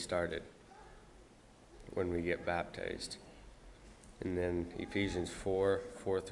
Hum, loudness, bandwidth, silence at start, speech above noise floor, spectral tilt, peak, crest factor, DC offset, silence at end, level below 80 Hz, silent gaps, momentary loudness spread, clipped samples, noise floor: none; -38 LUFS; 11.5 kHz; 0 s; 24 dB; -5.5 dB/octave; -20 dBFS; 20 dB; under 0.1%; 0 s; -58 dBFS; none; 23 LU; under 0.1%; -61 dBFS